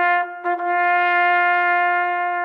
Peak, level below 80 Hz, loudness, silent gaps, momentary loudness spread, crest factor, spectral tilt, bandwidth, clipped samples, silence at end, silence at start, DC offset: -6 dBFS; under -90 dBFS; -18 LUFS; none; 5 LU; 12 dB; -3 dB/octave; 5.2 kHz; under 0.1%; 0 s; 0 s; under 0.1%